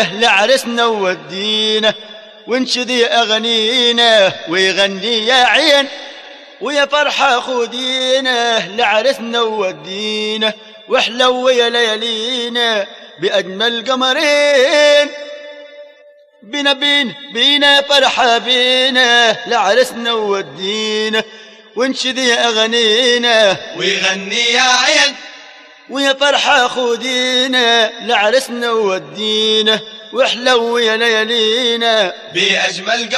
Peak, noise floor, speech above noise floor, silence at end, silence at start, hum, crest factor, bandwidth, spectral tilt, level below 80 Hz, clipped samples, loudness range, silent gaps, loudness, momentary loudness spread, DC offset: 0 dBFS; -45 dBFS; 31 dB; 0 s; 0 s; none; 14 dB; 13.5 kHz; -1.5 dB/octave; -64 dBFS; under 0.1%; 4 LU; none; -12 LUFS; 10 LU; under 0.1%